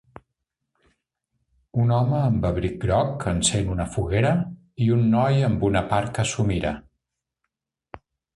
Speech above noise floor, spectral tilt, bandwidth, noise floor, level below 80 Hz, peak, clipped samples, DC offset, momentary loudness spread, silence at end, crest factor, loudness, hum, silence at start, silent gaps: 60 dB; -6 dB/octave; 11.5 kHz; -81 dBFS; -40 dBFS; -6 dBFS; under 0.1%; under 0.1%; 7 LU; 0.4 s; 16 dB; -23 LUFS; none; 1.75 s; none